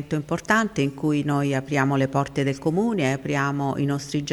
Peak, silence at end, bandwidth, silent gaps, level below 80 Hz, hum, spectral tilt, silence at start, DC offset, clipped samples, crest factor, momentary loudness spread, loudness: -4 dBFS; 0 s; 12.5 kHz; none; -54 dBFS; none; -6 dB/octave; 0 s; under 0.1%; under 0.1%; 18 dB; 4 LU; -23 LUFS